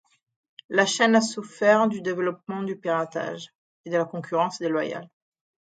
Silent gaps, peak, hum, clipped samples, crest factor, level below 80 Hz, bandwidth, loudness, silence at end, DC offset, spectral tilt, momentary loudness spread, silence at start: 3.55-3.84 s; -4 dBFS; none; under 0.1%; 22 dB; -76 dBFS; 9.2 kHz; -24 LUFS; 0.55 s; under 0.1%; -4 dB/octave; 12 LU; 0.7 s